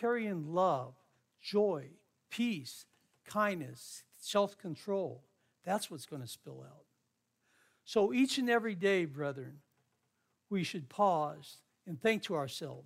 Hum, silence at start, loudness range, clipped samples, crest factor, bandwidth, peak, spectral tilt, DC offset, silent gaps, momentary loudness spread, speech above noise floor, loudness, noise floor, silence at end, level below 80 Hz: none; 0 s; 5 LU; under 0.1%; 20 dB; 16 kHz; -16 dBFS; -5 dB/octave; under 0.1%; none; 18 LU; 47 dB; -35 LUFS; -81 dBFS; 0 s; -86 dBFS